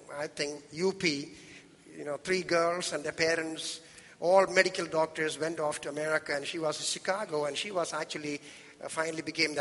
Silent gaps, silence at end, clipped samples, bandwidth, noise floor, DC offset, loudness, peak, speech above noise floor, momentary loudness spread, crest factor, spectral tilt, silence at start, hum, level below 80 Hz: none; 0 s; under 0.1%; 11.5 kHz; -52 dBFS; under 0.1%; -31 LUFS; -8 dBFS; 21 dB; 14 LU; 24 dB; -3 dB/octave; 0 s; none; -72 dBFS